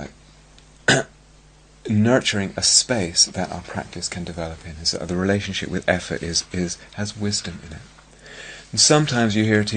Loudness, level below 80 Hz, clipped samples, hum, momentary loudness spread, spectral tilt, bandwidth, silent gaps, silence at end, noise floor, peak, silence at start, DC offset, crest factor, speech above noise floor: -20 LUFS; -48 dBFS; under 0.1%; none; 21 LU; -3 dB/octave; 9.6 kHz; none; 0 s; -50 dBFS; 0 dBFS; 0 s; under 0.1%; 22 dB; 29 dB